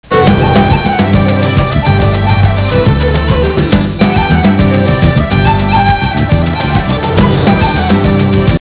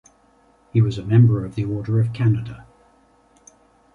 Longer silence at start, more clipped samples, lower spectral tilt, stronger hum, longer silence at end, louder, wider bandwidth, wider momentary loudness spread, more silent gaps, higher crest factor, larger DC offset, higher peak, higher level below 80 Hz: second, 0.1 s vs 0.75 s; first, 0.7% vs under 0.1%; first, -11 dB/octave vs -9 dB/octave; neither; second, 0 s vs 1.35 s; first, -10 LUFS vs -20 LUFS; second, 4 kHz vs 7 kHz; second, 3 LU vs 10 LU; neither; second, 8 dB vs 18 dB; first, 0.4% vs under 0.1%; first, 0 dBFS vs -4 dBFS; first, -18 dBFS vs -48 dBFS